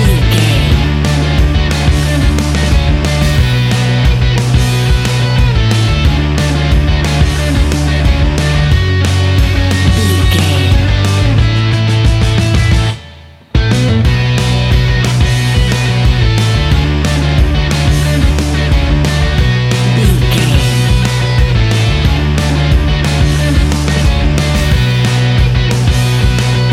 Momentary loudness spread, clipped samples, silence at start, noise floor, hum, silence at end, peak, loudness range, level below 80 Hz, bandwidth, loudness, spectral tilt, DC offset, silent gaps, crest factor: 2 LU; under 0.1%; 0 s; -34 dBFS; none; 0 s; 0 dBFS; 1 LU; -14 dBFS; 15 kHz; -11 LUFS; -5.5 dB/octave; under 0.1%; none; 10 dB